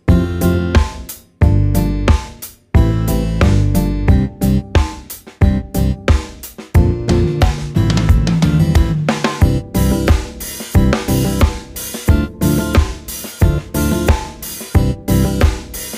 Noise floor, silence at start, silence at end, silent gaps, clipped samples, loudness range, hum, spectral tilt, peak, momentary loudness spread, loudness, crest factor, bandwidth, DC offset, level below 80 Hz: -34 dBFS; 0.05 s; 0 s; none; under 0.1%; 2 LU; none; -6.5 dB/octave; 0 dBFS; 11 LU; -16 LUFS; 14 dB; 16.5 kHz; under 0.1%; -20 dBFS